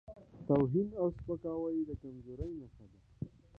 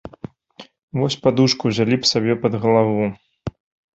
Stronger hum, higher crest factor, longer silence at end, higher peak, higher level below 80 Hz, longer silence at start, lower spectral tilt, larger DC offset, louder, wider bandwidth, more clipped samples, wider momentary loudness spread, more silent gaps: neither; about the same, 20 dB vs 18 dB; second, 0 s vs 0.45 s; second, -16 dBFS vs -2 dBFS; second, -56 dBFS vs -50 dBFS; about the same, 0.1 s vs 0.05 s; first, -11.5 dB/octave vs -5.5 dB/octave; neither; second, -36 LUFS vs -18 LUFS; second, 4.8 kHz vs 8 kHz; neither; about the same, 18 LU vs 17 LU; second, none vs 0.83-0.88 s